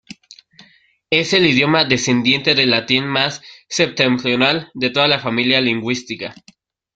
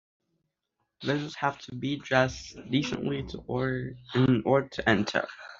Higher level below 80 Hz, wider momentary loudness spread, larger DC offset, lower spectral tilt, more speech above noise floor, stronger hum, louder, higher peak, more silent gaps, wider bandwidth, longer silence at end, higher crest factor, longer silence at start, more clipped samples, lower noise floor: about the same, -56 dBFS vs -56 dBFS; about the same, 10 LU vs 10 LU; neither; about the same, -4 dB/octave vs -4.5 dB/octave; second, 36 dB vs 52 dB; neither; first, -15 LUFS vs -29 LUFS; first, 0 dBFS vs -6 dBFS; neither; first, 9.2 kHz vs 7.6 kHz; first, 0.65 s vs 0.05 s; about the same, 18 dB vs 22 dB; second, 0.6 s vs 1 s; neither; second, -53 dBFS vs -81 dBFS